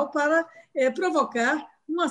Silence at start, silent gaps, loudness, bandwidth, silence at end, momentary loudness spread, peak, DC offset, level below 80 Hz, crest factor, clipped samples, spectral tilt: 0 s; none; -25 LUFS; 10.5 kHz; 0 s; 8 LU; -10 dBFS; under 0.1%; -76 dBFS; 16 dB; under 0.1%; -3 dB/octave